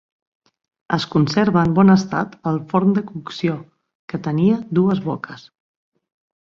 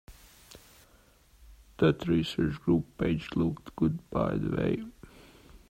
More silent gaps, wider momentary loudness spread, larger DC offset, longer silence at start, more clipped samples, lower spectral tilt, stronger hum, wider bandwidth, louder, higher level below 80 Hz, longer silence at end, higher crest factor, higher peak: first, 3.95-4.08 s vs none; first, 16 LU vs 4 LU; neither; first, 0.9 s vs 0.1 s; neither; about the same, -7.5 dB/octave vs -7.5 dB/octave; neither; second, 7 kHz vs 15.5 kHz; first, -19 LUFS vs -30 LUFS; about the same, -54 dBFS vs -50 dBFS; first, 1.1 s vs 0.1 s; about the same, 18 dB vs 20 dB; first, -2 dBFS vs -12 dBFS